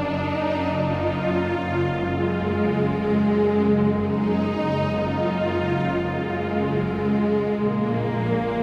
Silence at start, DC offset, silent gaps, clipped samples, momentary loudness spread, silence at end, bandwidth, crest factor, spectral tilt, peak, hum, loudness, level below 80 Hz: 0 s; under 0.1%; none; under 0.1%; 4 LU; 0 s; 7 kHz; 12 dB; -8.5 dB/octave; -10 dBFS; none; -23 LUFS; -48 dBFS